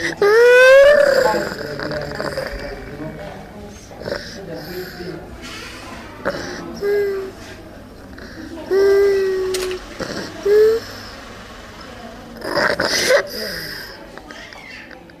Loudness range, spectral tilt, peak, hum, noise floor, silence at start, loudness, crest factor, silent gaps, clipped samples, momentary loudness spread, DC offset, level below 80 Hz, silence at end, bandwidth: 14 LU; -3.5 dB/octave; -4 dBFS; none; -37 dBFS; 0 s; -16 LUFS; 14 dB; none; under 0.1%; 23 LU; under 0.1%; -44 dBFS; 0.2 s; 14.5 kHz